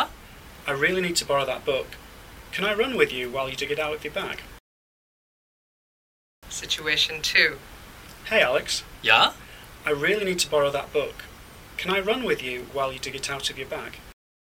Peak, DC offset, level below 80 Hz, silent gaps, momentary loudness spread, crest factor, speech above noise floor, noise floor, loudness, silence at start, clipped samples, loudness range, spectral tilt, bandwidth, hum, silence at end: -2 dBFS; under 0.1%; -52 dBFS; 4.60-6.42 s; 20 LU; 24 dB; 20 dB; -45 dBFS; -24 LUFS; 0 s; under 0.1%; 7 LU; -2.5 dB/octave; 17 kHz; none; 0.45 s